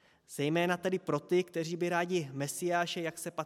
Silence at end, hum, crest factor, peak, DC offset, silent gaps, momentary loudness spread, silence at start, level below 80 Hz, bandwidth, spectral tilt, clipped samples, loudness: 0 s; none; 18 dB; -16 dBFS; under 0.1%; none; 6 LU; 0.3 s; -80 dBFS; 16 kHz; -5 dB/octave; under 0.1%; -33 LUFS